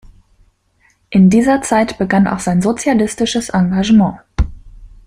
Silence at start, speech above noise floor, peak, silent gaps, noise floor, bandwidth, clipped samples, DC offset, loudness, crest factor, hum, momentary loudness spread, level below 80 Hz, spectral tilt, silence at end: 1.1 s; 44 dB; 0 dBFS; none; -57 dBFS; 11 kHz; under 0.1%; under 0.1%; -14 LUFS; 14 dB; none; 10 LU; -30 dBFS; -6 dB/octave; 0.2 s